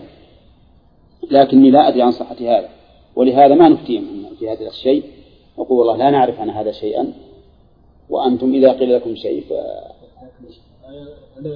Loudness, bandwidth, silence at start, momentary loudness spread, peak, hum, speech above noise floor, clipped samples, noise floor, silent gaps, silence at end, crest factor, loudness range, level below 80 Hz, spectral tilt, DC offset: -14 LUFS; 5.2 kHz; 0 s; 18 LU; 0 dBFS; none; 36 dB; under 0.1%; -50 dBFS; none; 0 s; 16 dB; 6 LU; -52 dBFS; -9.5 dB/octave; under 0.1%